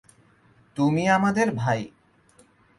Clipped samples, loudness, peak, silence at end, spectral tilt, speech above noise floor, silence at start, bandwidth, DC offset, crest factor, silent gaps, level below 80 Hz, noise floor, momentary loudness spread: under 0.1%; -23 LUFS; -8 dBFS; 0.9 s; -6.5 dB/octave; 36 dB; 0.75 s; 11.5 kHz; under 0.1%; 18 dB; none; -60 dBFS; -58 dBFS; 15 LU